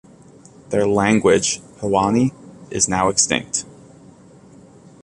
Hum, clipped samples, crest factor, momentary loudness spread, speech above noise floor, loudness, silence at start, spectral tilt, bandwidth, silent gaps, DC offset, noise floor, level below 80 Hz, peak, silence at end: none; under 0.1%; 20 dB; 10 LU; 28 dB; -18 LUFS; 0.7 s; -3.5 dB/octave; 11.5 kHz; none; under 0.1%; -46 dBFS; -48 dBFS; -2 dBFS; 1.35 s